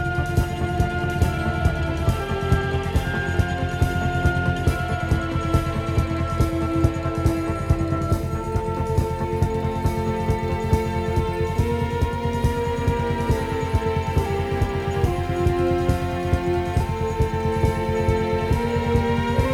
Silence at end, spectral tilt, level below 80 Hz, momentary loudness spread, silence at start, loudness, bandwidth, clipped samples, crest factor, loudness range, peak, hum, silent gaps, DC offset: 0 s; -7 dB/octave; -30 dBFS; 2 LU; 0 s; -23 LUFS; 15.5 kHz; under 0.1%; 16 dB; 1 LU; -6 dBFS; none; none; under 0.1%